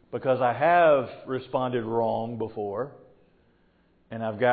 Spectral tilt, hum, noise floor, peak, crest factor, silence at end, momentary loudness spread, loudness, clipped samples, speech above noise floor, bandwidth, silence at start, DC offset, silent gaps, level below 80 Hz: -10.5 dB/octave; none; -64 dBFS; -10 dBFS; 16 dB; 0 s; 14 LU; -26 LUFS; under 0.1%; 39 dB; 4.8 kHz; 0.1 s; under 0.1%; none; -66 dBFS